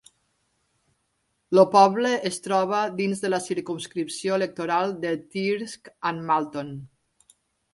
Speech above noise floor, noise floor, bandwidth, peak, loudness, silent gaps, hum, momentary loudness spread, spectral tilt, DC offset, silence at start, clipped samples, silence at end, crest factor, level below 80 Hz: 50 dB; -73 dBFS; 11.5 kHz; -4 dBFS; -24 LUFS; none; none; 13 LU; -5 dB/octave; under 0.1%; 1.5 s; under 0.1%; 0.85 s; 22 dB; -70 dBFS